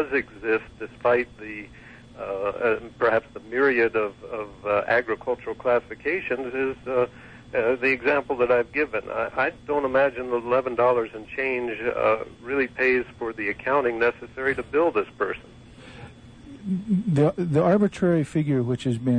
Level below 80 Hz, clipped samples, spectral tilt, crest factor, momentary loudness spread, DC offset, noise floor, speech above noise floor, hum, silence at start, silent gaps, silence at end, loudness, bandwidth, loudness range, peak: -54 dBFS; under 0.1%; -7.5 dB/octave; 16 dB; 10 LU; under 0.1%; -45 dBFS; 20 dB; none; 0 s; none; 0 s; -24 LUFS; 9.8 kHz; 3 LU; -8 dBFS